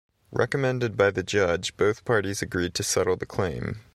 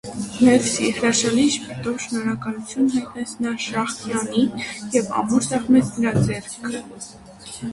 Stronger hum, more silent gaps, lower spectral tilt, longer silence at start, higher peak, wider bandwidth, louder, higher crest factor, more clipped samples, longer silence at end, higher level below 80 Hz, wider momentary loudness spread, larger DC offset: neither; neither; about the same, -4.5 dB/octave vs -4.5 dB/octave; first, 0.3 s vs 0.05 s; second, -8 dBFS vs -4 dBFS; first, 14 kHz vs 11.5 kHz; second, -26 LUFS vs -21 LUFS; about the same, 18 dB vs 18 dB; neither; first, 0.15 s vs 0 s; about the same, -52 dBFS vs -52 dBFS; second, 6 LU vs 13 LU; neither